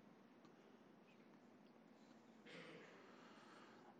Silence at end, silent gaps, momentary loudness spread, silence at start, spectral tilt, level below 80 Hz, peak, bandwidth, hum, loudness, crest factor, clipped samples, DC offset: 0 s; none; 8 LU; 0 s; -5 dB/octave; under -90 dBFS; -48 dBFS; 9 kHz; none; -65 LUFS; 16 dB; under 0.1%; under 0.1%